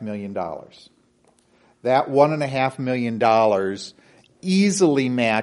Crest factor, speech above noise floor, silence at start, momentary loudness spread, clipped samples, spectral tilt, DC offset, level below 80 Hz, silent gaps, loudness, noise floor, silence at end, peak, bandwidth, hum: 20 dB; 40 dB; 0 s; 15 LU; under 0.1%; -5.5 dB/octave; under 0.1%; -66 dBFS; none; -20 LUFS; -60 dBFS; 0 s; -2 dBFS; 11.5 kHz; none